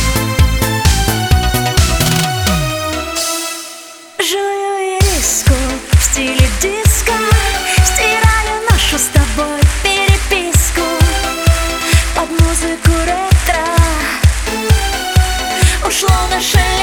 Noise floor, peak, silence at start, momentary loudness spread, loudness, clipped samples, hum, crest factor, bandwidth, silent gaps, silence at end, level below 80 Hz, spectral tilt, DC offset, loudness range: -33 dBFS; 0 dBFS; 0 s; 5 LU; -13 LUFS; under 0.1%; none; 12 dB; over 20 kHz; none; 0 s; -18 dBFS; -3.5 dB/octave; under 0.1%; 3 LU